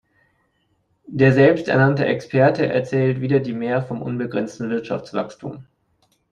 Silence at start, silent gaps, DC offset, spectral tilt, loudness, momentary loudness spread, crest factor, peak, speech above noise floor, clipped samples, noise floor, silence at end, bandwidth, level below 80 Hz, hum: 1.1 s; none; under 0.1%; -8 dB/octave; -19 LUFS; 12 LU; 18 dB; -2 dBFS; 47 dB; under 0.1%; -66 dBFS; 0.7 s; 7.4 kHz; -58 dBFS; none